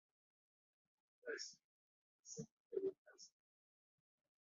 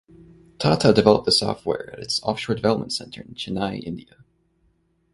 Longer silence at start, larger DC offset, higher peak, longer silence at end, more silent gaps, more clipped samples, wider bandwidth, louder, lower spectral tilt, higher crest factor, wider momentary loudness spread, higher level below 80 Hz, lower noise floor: first, 1.25 s vs 0.6 s; neither; second, -30 dBFS vs 0 dBFS; first, 1.3 s vs 1.15 s; first, 1.64-2.23 s, 2.51-2.70 s, 2.98-3.05 s vs none; neither; second, 7.4 kHz vs 11.5 kHz; second, -50 LUFS vs -21 LUFS; second, -3.5 dB/octave vs -5 dB/octave; about the same, 24 dB vs 24 dB; about the same, 17 LU vs 17 LU; second, under -90 dBFS vs -52 dBFS; first, under -90 dBFS vs -65 dBFS